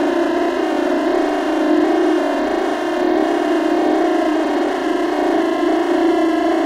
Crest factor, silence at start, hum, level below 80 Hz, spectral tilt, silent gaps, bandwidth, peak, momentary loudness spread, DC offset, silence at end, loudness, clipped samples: 12 dB; 0 s; none; -52 dBFS; -4 dB/octave; none; 13 kHz; -4 dBFS; 3 LU; under 0.1%; 0 s; -17 LUFS; under 0.1%